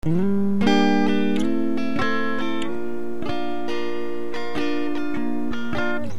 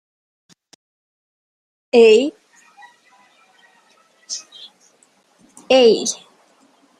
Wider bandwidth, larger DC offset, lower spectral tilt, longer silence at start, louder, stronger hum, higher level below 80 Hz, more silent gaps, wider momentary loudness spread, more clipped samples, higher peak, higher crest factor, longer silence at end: first, 13 kHz vs 11 kHz; first, 8% vs under 0.1%; first, -6.5 dB/octave vs -2.5 dB/octave; second, 0 s vs 1.95 s; second, -24 LUFS vs -15 LUFS; neither; first, -50 dBFS vs -70 dBFS; neither; second, 10 LU vs 21 LU; neither; second, -6 dBFS vs -2 dBFS; about the same, 16 dB vs 20 dB; second, 0 s vs 0.85 s